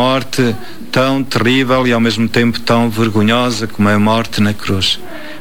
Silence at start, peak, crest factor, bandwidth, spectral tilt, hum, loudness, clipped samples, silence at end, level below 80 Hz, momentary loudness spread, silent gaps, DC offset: 0 s; -2 dBFS; 12 dB; 19.5 kHz; -5.5 dB/octave; none; -14 LUFS; under 0.1%; 0 s; -46 dBFS; 5 LU; none; 6%